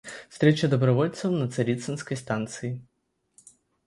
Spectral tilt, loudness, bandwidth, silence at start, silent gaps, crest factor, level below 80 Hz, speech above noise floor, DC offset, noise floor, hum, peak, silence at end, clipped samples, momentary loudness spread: -6.5 dB/octave; -26 LUFS; 11.5 kHz; 0.05 s; none; 20 dB; -64 dBFS; 50 dB; under 0.1%; -75 dBFS; none; -6 dBFS; 1.05 s; under 0.1%; 13 LU